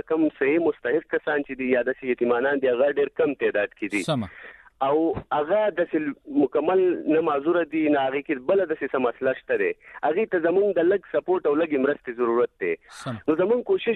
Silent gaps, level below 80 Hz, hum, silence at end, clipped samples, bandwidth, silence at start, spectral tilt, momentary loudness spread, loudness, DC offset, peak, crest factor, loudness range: none; -62 dBFS; none; 0 s; under 0.1%; 11 kHz; 0.1 s; -6.5 dB/octave; 6 LU; -24 LUFS; under 0.1%; -10 dBFS; 14 dB; 1 LU